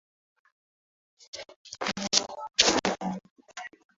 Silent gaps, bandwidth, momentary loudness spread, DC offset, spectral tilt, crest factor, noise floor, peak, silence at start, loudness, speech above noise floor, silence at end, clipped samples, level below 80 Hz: 1.56-1.65 s, 3.31-3.36 s; 8 kHz; 21 LU; under 0.1%; -1 dB/octave; 28 dB; under -90 dBFS; -4 dBFS; 1.35 s; -26 LUFS; over 61 dB; 0.3 s; under 0.1%; -62 dBFS